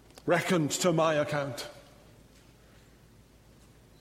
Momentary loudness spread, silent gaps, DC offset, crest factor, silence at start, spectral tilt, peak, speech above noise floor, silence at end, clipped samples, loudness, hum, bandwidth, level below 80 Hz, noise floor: 13 LU; none; under 0.1%; 20 dB; 0.25 s; -4.5 dB/octave; -12 dBFS; 30 dB; 2.2 s; under 0.1%; -28 LUFS; none; 16 kHz; -64 dBFS; -58 dBFS